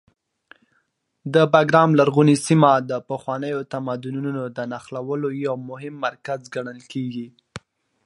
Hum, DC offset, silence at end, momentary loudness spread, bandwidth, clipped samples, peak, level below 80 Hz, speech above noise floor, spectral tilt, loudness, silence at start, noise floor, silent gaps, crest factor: none; under 0.1%; 0.45 s; 17 LU; 11.5 kHz; under 0.1%; 0 dBFS; -66 dBFS; 49 dB; -6.5 dB/octave; -21 LUFS; 1.25 s; -70 dBFS; none; 22 dB